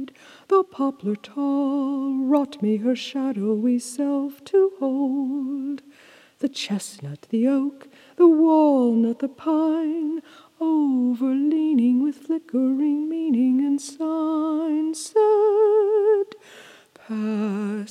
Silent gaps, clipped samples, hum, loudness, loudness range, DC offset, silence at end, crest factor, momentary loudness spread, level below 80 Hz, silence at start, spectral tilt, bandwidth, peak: none; under 0.1%; none; -22 LUFS; 5 LU; under 0.1%; 0 s; 16 dB; 11 LU; -84 dBFS; 0 s; -6 dB/octave; 13 kHz; -6 dBFS